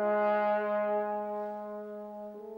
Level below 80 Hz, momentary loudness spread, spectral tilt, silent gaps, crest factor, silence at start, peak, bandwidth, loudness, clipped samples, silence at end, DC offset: -80 dBFS; 14 LU; -8 dB/octave; none; 12 dB; 0 s; -20 dBFS; 16 kHz; -32 LUFS; under 0.1%; 0 s; under 0.1%